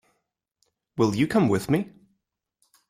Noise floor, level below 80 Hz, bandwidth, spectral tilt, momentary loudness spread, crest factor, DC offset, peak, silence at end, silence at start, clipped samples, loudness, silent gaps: -78 dBFS; -60 dBFS; 16 kHz; -6.5 dB/octave; 15 LU; 18 dB; under 0.1%; -8 dBFS; 1.05 s; 0.95 s; under 0.1%; -24 LUFS; none